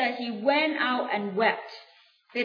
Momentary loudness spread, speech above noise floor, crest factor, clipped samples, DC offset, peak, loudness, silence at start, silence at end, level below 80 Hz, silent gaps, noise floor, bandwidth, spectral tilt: 13 LU; 20 dB; 18 dB; under 0.1%; under 0.1%; -10 dBFS; -26 LUFS; 0 s; 0 s; under -90 dBFS; none; -46 dBFS; 5.4 kHz; -6 dB/octave